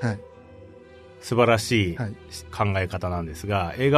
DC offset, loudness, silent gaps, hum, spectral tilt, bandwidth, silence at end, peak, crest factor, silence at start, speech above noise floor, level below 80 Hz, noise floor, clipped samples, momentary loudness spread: under 0.1%; -24 LUFS; none; none; -5.5 dB/octave; 13.5 kHz; 0 s; -4 dBFS; 22 dB; 0 s; 23 dB; -48 dBFS; -47 dBFS; under 0.1%; 16 LU